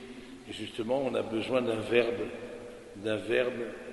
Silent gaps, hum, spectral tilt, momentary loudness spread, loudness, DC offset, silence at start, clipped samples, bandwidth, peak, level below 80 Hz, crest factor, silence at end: none; none; -5.5 dB/octave; 16 LU; -31 LUFS; under 0.1%; 0 s; under 0.1%; 11.5 kHz; -10 dBFS; -62 dBFS; 22 dB; 0 s